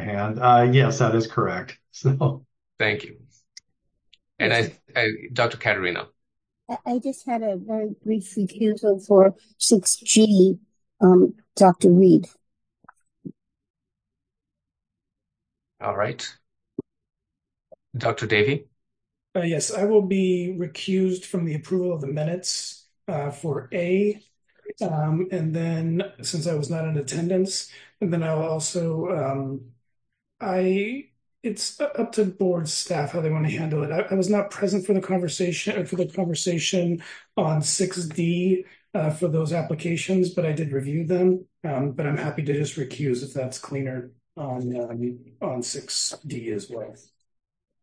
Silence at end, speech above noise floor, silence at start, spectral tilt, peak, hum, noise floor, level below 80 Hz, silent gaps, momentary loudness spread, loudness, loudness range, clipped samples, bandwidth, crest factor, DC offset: 0.9 s; 62 dB; 0 s; -5 dB/octave; -4 dBFS; none; -85 dBFS; -68 dBFS; 13.70-13.74 s; 15 LU; -23 LUFS; 10 LU; under 0.1%; 10.5 kHz; 20 dB; under 0.1%